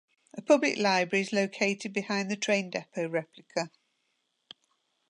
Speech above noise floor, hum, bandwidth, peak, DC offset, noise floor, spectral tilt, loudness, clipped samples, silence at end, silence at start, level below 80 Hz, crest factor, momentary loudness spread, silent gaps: 48 dB; none; 10.5 kHz; -10 dBFS; under 0.1%; -77 dBFS; -4 dB/octave; -29 LUFS; under 0.1%; 1.4 s; 0.35 s; -82 dBFS; 20 dB; 11 LU; none